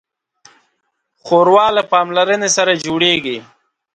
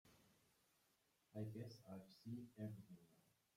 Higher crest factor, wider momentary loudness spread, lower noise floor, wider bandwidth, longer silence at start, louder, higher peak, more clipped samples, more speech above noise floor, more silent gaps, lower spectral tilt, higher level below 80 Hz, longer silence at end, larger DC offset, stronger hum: about the same, 16 dB vs 20 dB; second, 6 LU vs 9 LU; second, -69 dBFS vs -83 dBFS; second, 9.4 kHz vs 16 kHz; first, 1.25 s vs 0.05 s; first, -13 LUFS vs -56 LUFS; first, 0 dBFS vs -38 dBFS; neither; first, 56 dB vs 29 dB; neither; second, -2.5 dB/octave vs -7.5 dB/octave; first, -58 dBFS vs -86 dBFS; first, 0.55 s vs 0.35 s; neither; neither